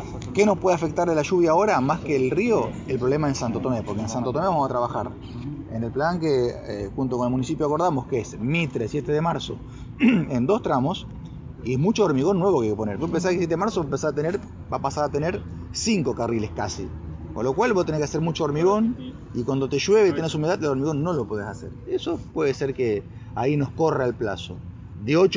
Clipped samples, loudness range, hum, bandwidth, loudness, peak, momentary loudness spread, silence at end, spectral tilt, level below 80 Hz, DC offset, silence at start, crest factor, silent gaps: under 0.1%; 3 LU; none; 7.6 kHz; -24 LUFS; -6 dBFS; 13 LU; 0 s; -6 dB/octave; -44 dBFS; under 0.1%; 0 s; 16 dB; none